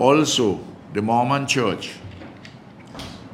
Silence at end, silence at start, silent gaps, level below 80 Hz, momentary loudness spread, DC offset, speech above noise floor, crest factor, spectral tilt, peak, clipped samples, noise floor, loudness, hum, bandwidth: 0 s; 0 s; none; -58 dBFS; 22 LU; under 0.1%; 22 dB; 22 dB; -4.5 dB/octave; 0 dBFS; under 0.1%; -42 dBFS; -21 LUFS; none; 15.5 kHz